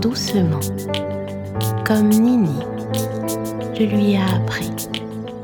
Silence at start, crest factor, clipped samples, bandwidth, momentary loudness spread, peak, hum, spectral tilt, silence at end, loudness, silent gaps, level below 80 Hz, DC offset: 0 s; 16 dB; under 0.1%; over 20 kHz; 11 LU; -4 dBFS; none; -6 dB/octave; 0 s; -20 LUFS; none; -50 dBFS; under 0.1%